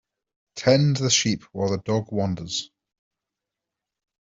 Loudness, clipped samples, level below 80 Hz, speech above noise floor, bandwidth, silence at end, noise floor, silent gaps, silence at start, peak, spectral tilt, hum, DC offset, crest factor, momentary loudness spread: -23 LUFS; under 0.1%; -58 dBFS; 64 dB; 7.8 kHz; 1.65 s; -86 dBFS; none; 0.55 s; -4 dBFS; -4.5 dB/octave; none; under 0.1%; 22 dB; 11 LU